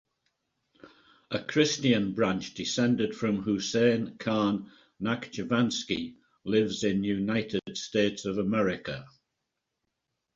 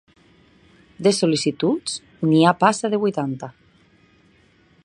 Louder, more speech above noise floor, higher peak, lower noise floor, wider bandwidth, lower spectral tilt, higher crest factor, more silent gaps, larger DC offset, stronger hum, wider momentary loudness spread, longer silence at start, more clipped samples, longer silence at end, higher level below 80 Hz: second, -29 LUFS vs -20 LUFS; first, 56 dB vs 37 dB; second, -10 dBFS vs -2 dBFS; first, -84 dBFS vs -56 dBFS; second, 7.8 kHz vs 11 kHz; about the same, -5 dB/octave vs -5 dB/octave; about the same, 18 dB vs 22 dB; neither; neither; neither; second, 10 LU vs 13 LU; second, 0.85 s vs 1 s; neither; about the same, 1.25 s vs 1.35 s; about the same, -62 dBFS vs -64 dBFS